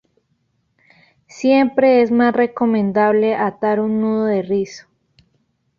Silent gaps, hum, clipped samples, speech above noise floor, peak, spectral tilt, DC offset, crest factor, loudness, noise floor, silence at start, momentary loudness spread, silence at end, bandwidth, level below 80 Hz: none; none; under 0.1%; 50 dB; -2 dBFS; -7 dB/octave; under 0.1%; 16 dB; -16 LUFS; -66 dBFS; 1.35 s; 7 LU; 1 s; 7.4 kHz; -62 dBFS